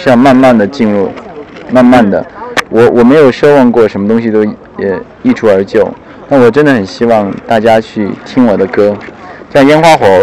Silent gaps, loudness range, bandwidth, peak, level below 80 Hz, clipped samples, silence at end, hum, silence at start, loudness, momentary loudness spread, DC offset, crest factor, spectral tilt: none; 3 LU; 13 kHz; 0 dBFS; -40 dBFS; 5%; 0 s; none; 0 s; -8 LUFS; 11 LU; 0.6%; 8 dB; -6.5 dB/octave